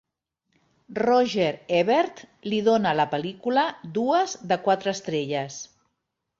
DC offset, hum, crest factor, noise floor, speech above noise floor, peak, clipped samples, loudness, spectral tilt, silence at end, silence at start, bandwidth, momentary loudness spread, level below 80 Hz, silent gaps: under 0.1%; none; 16 dB; -80 dBFS; 56 dB; -8 dBFS; under 0.1%; -24 LUFS; -5 dB/octave; 0.75 s; 0.9 s; 7.6 kHz; 9 LU; -68 dBFS; none